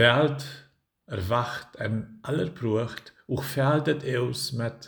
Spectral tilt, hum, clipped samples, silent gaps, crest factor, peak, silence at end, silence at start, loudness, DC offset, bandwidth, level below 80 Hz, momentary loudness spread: -5.5 dB/octave; none; under 0.1%; none; 22 dB; -4 dBFS; 0 s; 0 s; -28 LUFS; under 0.1%; over 20 kHz; -58 dBFS; 12 LU